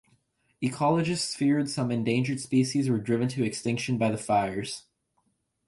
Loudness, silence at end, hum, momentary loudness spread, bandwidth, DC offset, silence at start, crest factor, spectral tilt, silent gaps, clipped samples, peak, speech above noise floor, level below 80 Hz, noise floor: -27 LUFS; 0.85 s; none; 7 LU; 11.5 kHz; under 0.1%; 0.6 s; 16 dB; -5.5 dB/octave; none; under 0.1%; -12 dBFS; 47 dB; -62 dBFS; -74 dBFS